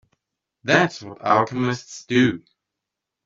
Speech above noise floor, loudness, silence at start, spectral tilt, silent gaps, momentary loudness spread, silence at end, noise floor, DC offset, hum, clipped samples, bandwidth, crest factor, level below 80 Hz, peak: 63 dB; -21 LUFS; 0.65 s; -5.5 dB/octave; none; 12 LU; 0.85 s; -84 dBFS; under 0.1%; none; under 0.1%; 7.8 kHz; 20 dB; -62 dBFS; -2 dBFS